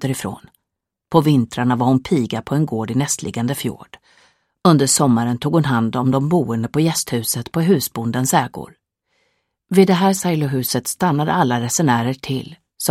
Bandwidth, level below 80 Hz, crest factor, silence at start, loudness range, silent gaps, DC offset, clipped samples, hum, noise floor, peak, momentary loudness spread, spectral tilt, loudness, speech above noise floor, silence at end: 16 kHz; -54 dBFS; 18 dB; 0 s; 3 LU; none; under 0.1%; under 0.1%; none; -81 dBFS; 0 dBFS; 10 LU; -5 dB/octave; -18 LUFS; 63 dB; 0 s